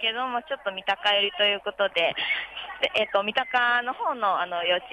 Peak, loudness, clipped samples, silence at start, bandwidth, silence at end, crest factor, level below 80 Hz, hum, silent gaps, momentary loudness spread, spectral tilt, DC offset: -10 dBFS; -25 LUFS; under 0.1%; 0 s; 10.5 kHz; 0 s; 16 dB; -66 dBFS; none; none; 7 LU; -3 dB/octave; under 0.1%